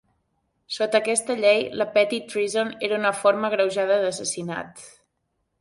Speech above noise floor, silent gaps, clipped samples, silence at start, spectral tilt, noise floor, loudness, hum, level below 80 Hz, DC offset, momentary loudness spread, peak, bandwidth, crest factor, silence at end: 52 dB; none; under 0.1%; 0.7 s; -2.5 dB/octave; -75 dBFS; -23 LUFS; none; -70 dBFS; under 0.1%; 9 LU; -6 dBFS; 11.5 kHz; 18 dB; 0.7 s